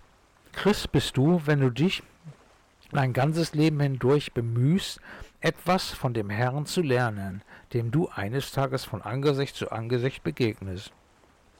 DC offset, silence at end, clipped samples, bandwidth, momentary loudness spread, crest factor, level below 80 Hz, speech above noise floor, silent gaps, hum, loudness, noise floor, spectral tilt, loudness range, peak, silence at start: under 0.1%; 0.7 s; under 0.1%; 17 kHz; 12 LU; 12 dB; -52 dBFS; 34 dB; none; none; -27 LUFS; -60 dBFS; -6.5 dB/octave; 3 LU; -16 dBFS; 0.55 s